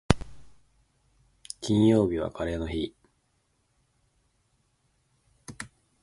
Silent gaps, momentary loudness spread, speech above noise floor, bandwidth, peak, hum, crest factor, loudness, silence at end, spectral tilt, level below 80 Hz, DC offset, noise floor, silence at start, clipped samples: none; 24 LU; 47 dB; 11.5 kHz; 0 dBFS; none; 30 dB; -27 LUFS; 0.35 s; -6.5 dB/octave; -46 dBFS; under 0.1%; -72 dBFS; 0.1 s; under 0.1%